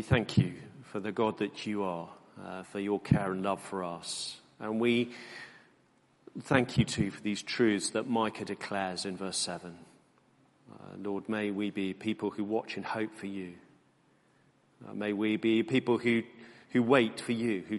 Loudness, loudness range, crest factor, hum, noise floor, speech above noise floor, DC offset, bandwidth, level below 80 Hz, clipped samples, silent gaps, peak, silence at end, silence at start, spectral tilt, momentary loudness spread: -32 LUFS; 6 LU; 26 dB; none; -67 dBFS; 36 dB; under 0.1%; 11.5 kHz; -62 dBFS; under 0.1%; none; -8 dBFS; 0 s; 0 s; -5.5 dB/octave; 16 LU